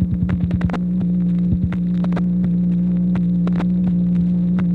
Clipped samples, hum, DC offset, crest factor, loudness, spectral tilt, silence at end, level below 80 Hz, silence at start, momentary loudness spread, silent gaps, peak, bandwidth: under 0.1%; 60 Hz at -35 dBFS; under 0.1%; 12 dB; -19 LUFS; -11 dB/octave; 0 s; -34 dBFS; 0 s; 2 LU; none; -6 dBFS; 4.1 kHz